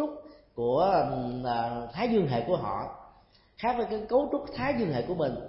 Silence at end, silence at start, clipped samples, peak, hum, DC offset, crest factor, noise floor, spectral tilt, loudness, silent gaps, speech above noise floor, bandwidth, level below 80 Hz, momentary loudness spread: 0 s; 0 s; under 0.1%; -14 dBFS; none; under 0.1%; 16 dB; -59 dBFS; -10.5 dB/octave; -29 LUFS; none; 31 dB; 5.8 kHz; -54 dBFS; 10 LU